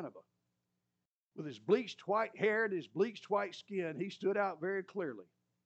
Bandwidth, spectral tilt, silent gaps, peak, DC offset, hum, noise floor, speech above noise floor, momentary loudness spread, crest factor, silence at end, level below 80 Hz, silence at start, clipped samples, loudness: 8.2 kHz; -6 dB/octave; 1.06-1.30 s; -18 dBFS; under 0.1%; 60 Hz at -65 dBFS; -89 dBFS; 52 dB; 13 LU; 20 dB; 0.4 s; under -90 dBFS; 0 s; under 0.1%; -36 LUFS